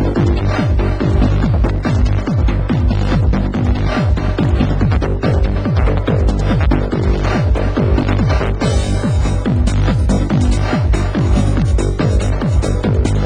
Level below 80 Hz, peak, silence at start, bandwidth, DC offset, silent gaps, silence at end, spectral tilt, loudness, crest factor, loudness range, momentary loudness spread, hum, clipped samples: -16 dBFS; -2 dBFS; 0 s; 10 kHz; 0.8%; none; 0 s; -7.5 dB/octave; -15 LUFS; 12 dB; 0 LU; 2 LU; none; under 0.1%